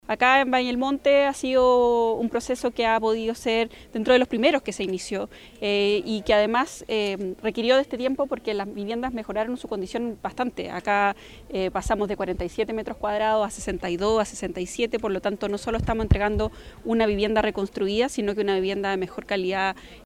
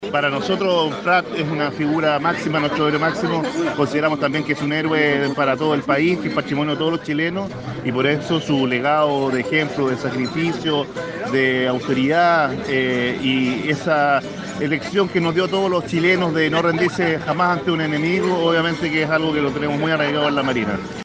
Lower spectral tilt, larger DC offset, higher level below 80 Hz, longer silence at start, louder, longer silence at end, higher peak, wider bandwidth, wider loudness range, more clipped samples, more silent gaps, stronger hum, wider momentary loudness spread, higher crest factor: about the same, -5 dB/octave vs -6 dB/octave; neither; first, -42 dBFS vs -54 dBFS; about the same, 0.1 s vs 0 s; second, -24 LUFS vs -19 LUFS; about the same, 0 s vs 0 s; about the same, -6 dBFS vs -4 dBFS; first, 15.5 kHz vs 9.4 kHz; first, 5 LU vs 2 LU; neither; neither; neither; first, 9 LU vs 5 LU; about the same, 18 dB vs 16 dB